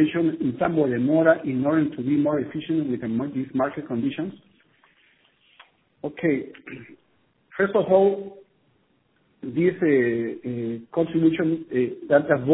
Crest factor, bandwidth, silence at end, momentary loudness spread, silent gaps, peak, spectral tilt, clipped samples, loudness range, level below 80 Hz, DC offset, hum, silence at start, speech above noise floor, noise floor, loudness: 20 dB; 4 kHz; 0 s; 14 LU; none; -4 dBFS; -11.5 dB/octave; under 0.1%; 8 LU; -64 dBFS; under 0.1%; none; 0 s; 43 dB; -66 dBFS; -23 LUFS